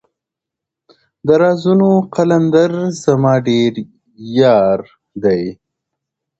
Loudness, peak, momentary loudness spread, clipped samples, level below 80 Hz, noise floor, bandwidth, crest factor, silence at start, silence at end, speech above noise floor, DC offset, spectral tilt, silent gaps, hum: -14 LUFS; 0 dBFS; 11 LU; under 0.1%; -54 dBFS; -83 dBFS; 8.2 kHz; 14 dB; 1.25 s; 0.85 s; 70 dB; under 0.1%; -7 dB/octave; none; none